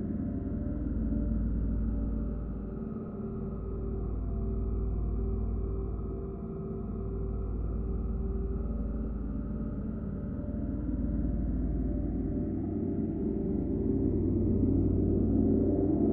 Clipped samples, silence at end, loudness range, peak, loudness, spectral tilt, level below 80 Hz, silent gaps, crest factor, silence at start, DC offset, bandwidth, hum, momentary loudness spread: under 0.1%; 0 s; 6 LU; -16 dBFS; -33 LUFS; -14 dB/octave; -36 dBFS; none; 16 dB; 0 s; under 0.1%; 2.1 kHz; none; 10 LU